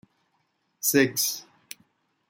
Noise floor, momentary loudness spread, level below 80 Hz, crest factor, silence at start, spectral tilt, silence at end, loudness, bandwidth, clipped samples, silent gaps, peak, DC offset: -73 dBFS; 23 LU; -74 dBFS; 22 dB; 0.85 s; -2.5 dB/octave; 0.85 s; -24 LUFS; 17 kHz; under 0.1%; none; -6 dBFS; under 0.1%